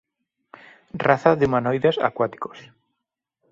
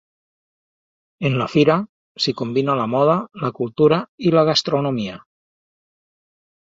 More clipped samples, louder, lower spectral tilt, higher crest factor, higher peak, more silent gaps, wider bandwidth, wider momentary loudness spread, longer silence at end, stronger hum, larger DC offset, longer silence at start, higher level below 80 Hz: neither; about the same, -21 LUFS vs -19 LUFS; first, -7.5 dB/octave vs -6 dB/octave; about the same, 22 dB vs 20 dB; about the same, -2 dBFS vs -2 dBFS; second, none vs 1.89-2.15 s, 4.08-4.18 s; about the same, 7.6 kHz vs 7.8 kHz; first, 17 LU vs 9 LU; second, 0.9 s vs 1.55 s; neither; neither; second, 0.95 s vs 1.2 s; about the same, -56 dBFS vs -60 dBFS